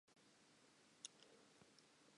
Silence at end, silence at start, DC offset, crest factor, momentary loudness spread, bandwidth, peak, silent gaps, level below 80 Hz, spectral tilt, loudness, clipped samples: 0 s; 0.05 s; under 0.1%; 34 dB; 10 LU; 11 kHz; -34 dBFS; none; under -90 dBFS; -1 dB/octave; -63 LUFS; under 0.1%